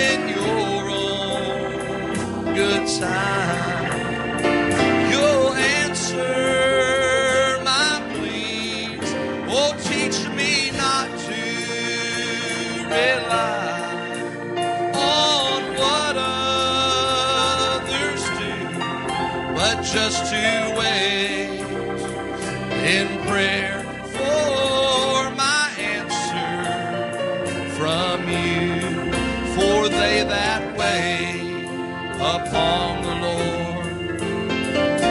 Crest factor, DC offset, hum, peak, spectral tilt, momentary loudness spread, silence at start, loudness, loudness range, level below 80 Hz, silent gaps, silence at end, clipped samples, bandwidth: 16 dB; under 0.1%; none; -4 dBFS; -3.5 dB/octave; 8 LU; 0 s; -21 LUFS; 4 LU; -46 dBFS; none; 0 s; under 0.1%; 11.5 kHz